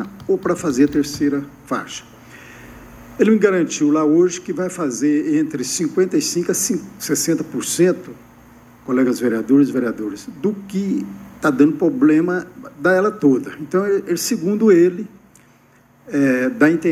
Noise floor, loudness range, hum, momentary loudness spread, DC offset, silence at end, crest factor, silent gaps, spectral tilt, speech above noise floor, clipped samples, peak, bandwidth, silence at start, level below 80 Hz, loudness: -52 dBFS; 3 LU; none; 11 LU; under 0.1%; 0 s; 18 dB; none; -5 dB/octave; 35 dB; under 0.1%; 0 dBFS; 15.5 kHz; 0 s; -56 dBFS; -18 LUFS